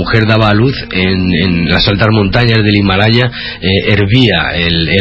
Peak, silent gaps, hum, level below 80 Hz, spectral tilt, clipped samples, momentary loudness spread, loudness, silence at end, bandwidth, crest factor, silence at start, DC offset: 0 dBFS; none; none; -26 dBFS; -7.5 dB/octave; 0.3%; 4 LU; -10 LUFS; 0 s; 8 kHz; 10 dB; 0 s; under 0.1%